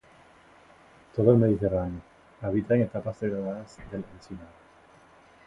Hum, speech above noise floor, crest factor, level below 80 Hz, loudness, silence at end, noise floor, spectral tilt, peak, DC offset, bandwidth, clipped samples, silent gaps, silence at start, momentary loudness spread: none; 29 dB; 22 dB; -52 dBFS; -27 LUFS; 1 s; -56 dBFS; -10 dB/octave; -6 dBFS; under 0.1%; 7.8 kHz; under 0.1%; none; 1.15 s; 21 LU